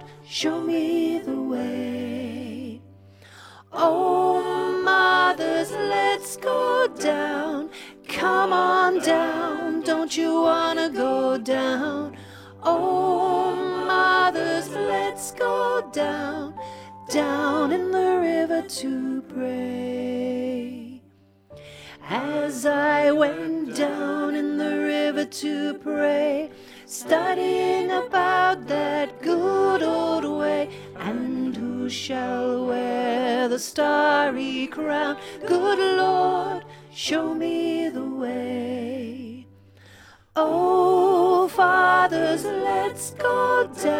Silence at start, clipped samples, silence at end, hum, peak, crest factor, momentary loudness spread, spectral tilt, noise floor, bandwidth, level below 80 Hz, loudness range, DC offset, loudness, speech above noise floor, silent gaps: 0 s; under 0.1%; 0 s; none; -6 dBFS; 18 dB; 12 LU; -4 dB/octave; -56 dBFS; 16.5 kHz; -66 dBFS; 6 LU; under 0.1%; -23 LUFS; 34 dB; none